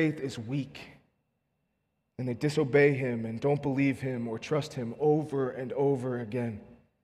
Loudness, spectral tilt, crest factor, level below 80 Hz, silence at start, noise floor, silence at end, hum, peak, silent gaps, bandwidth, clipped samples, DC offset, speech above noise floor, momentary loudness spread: -30 LUFS; -7.5 dB/octave; 20 dB; -68 dBFS; 0 s; -79 dBFS; 0.3 s; none; -10 dBFS; none; 12 kHz; under 0.1%; under 0.1%; 50 dB; 12 LU